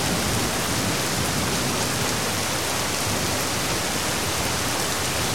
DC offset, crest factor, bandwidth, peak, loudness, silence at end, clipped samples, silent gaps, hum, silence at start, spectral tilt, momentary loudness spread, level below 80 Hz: 1%; 16 dB; 16.5 kHz; -8 dBFS; -23 LUFS; 0 s; under 0.1%; none; none; 0 s; -2.5 dB/octave; 1 LU; -42 dBFS